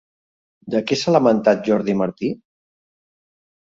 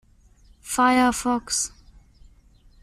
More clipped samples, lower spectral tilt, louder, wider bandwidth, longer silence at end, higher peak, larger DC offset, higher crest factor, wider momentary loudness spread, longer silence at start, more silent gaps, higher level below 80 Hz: neither; first, -6 dB/octave vs -2 dB/octave; first, -19 LUFS vs -22 LUFS; second, 7.8 kHz vs 15 kHz; first, 1.45 s vs 1.15 s; first, -2 dBFS vs -8 dBFS; neither; about the same, 18 dB vs 18 dB; about the same, 11 LU vs 12 LU; about the same, 0.65 s vs 0.65 s; neither; second, -62 dBFS vs -50 dBFS